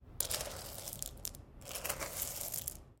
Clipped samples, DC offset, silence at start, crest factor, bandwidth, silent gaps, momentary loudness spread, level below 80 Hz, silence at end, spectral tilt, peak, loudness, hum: under 0.1%; under 0.1%; 0 s; 30 dB; 17 kHz; none; 9 LU; -56 dBFS; 0 s; -1.5 dB/octave; -14 dBFS; -40 LUFS; none